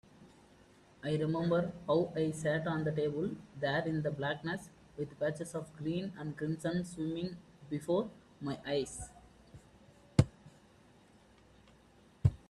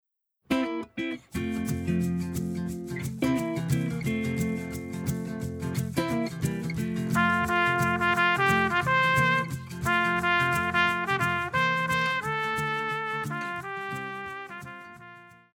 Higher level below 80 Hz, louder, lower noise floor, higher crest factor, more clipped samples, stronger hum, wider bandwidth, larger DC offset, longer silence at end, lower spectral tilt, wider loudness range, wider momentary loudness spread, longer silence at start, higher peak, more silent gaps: second, -60 dBFS vs -52 dBFS; second, -36 LUFS vs -27 LUFS; first, -63 dBFS vs -50 dBFS; first, 28 dB vs 18 dB; neither; neither; second, 12.5 kHz vs over 20 kHz; neither; about the same, 0.15 s vs 0.25 s; about the same, -6.5 dB/octave vs -5.5 dB/octave; about the same, 5 LU vs 7 LU; about the same, 11 LU vs 11 LU; second, 0.2 s vs 0.5 s; about the same, -8 dBFS vs -10 dBFS; neither